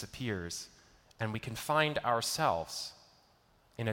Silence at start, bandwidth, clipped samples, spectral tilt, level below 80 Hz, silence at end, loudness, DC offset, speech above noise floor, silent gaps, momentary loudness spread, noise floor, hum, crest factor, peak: 0 s; 17 kHz; under 0.1%; -4 dB/octave; -62 dBFS; 0 s; -34 LUFS; under 0.1%; 33 dB; none; 13 LU; -67 dBFS; none; 20 dB; -14 dBFS